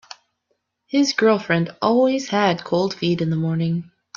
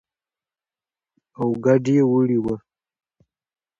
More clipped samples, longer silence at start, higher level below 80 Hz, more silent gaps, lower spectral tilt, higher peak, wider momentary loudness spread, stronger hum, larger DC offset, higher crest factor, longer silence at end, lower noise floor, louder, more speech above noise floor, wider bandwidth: neither; second, 0.95 s vs 1.4 s; about the same, -62 dBFS vs -60 dBFS; neither; second, -6 dB/octave vs -9 dB/octave; about the same, -4 dBFS vs -4 dBFS; second, 6 LU vs 11 LU; neither; neither; about the same, 16 dB vs 20 dB; second, 0.35 s vs 1.2 s; second, -72 dBFS vs under -90 dBFS; about the same, -20 LUFS vs -20 LUFS; second, 53 dB vs over 72 dB; about the same, 7.4 kHz vs 7.6 kHz